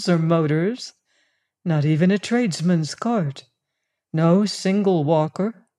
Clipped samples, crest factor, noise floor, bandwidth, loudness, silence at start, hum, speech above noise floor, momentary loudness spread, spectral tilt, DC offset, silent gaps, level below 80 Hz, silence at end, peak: under 0.1%; 16 dB; -79 dBFS; 11 kHz; -21 LUFS; 0 s; none; 59 dB; 11 LU; -6.5 dB/octave; under 0.1%; none; -72 dBFS; 0.25 s; -6 dBFS